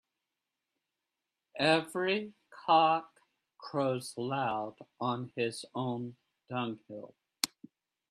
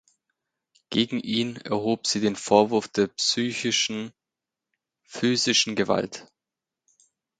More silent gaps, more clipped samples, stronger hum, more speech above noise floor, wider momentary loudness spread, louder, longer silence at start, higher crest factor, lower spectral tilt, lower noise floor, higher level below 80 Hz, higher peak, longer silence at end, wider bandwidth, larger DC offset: neither; neither; neither; second, 56 dB vs 64 dB; first, 18 LU vs 9 LU; second, -33 LUFS vs -24 LUFS; first, 1.55 s vs 0.9 s; first, 28 dB vs 22 dB; first, -4.5 dB/octave vs -3 dB/octave; about the same, -88 dBFS vs -88 dBFS; second, -80 dBFS vs -66 dBFS; second, -8 dBFS vs -4 dBFS; second, 0.65 s vs 1.15 s; first, 13.5 kHz vs 9.4 kHz; neither